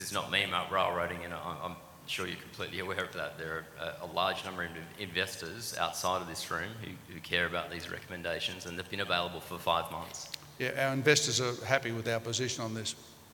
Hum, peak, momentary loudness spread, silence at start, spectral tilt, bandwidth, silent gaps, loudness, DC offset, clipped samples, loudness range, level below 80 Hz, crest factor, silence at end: none; -8 dBFS; 11 LU; 0 s; -3 dB/octave; 19.5 kHz; none; -34 LUFS; under 0.1%; under 0.1%; 6 LU; -64 dBFS; 26 dB; 0 s